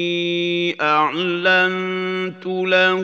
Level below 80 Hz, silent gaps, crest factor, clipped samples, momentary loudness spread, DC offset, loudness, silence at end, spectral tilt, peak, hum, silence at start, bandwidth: -78 dBFS; none; 16 dB; under 0.1%; 8 LU; under 0.1%; -18 LUFS; 0 s; -5.5 dB/octave; -2 dBFS; none; 0 s; 7.2 kHz